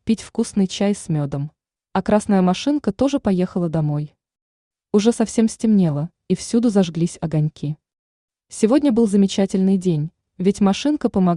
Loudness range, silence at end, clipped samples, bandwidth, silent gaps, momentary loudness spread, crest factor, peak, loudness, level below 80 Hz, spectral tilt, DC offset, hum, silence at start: 2 LU; 0 s; under 0.1%; 11 kHz; 4.42-4.71 s, 7.99-8.28 s; 9 LU; 16 dB; -4 dBFS; -20 LUFS; -52 dBFS; -6.5 dB/octave; under 0.1%; none; 0.05 s